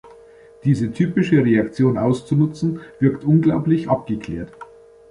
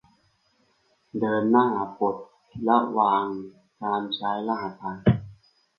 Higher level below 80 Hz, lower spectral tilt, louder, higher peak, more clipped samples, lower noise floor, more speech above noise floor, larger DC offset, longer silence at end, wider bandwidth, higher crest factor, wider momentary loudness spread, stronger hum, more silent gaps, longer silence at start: first, -50 dBFS vs -56 dBFS; about the same, -9 dB/octave vs -9.5 dB/octave; first, -19 LUFS vs -25 LUFS; about the same, -4 dBFS vs -6 dBFS; neither; second, -46 dBFS vs -67 dBFS; second, 28 dB vs 43 dB; neither; about the same, 0.45 s vs 0.45 s; first, 10.5 kHz vs 5.4 kHz; about the same, 16 dB vs 20 dB; second, 10 LU vs 15 LU; neither; neither; second, 0.65 s vs 1.15 s